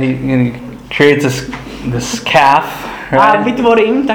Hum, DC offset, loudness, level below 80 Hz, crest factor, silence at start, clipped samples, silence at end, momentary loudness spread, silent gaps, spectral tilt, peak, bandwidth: none; under 0.1%; -12 LUFS; -38 dBFS; 12 dB; 0 s; 0.3%; 0 s; 13 LU; none; -5 dB/octave; 0 dBFS; 20 kHz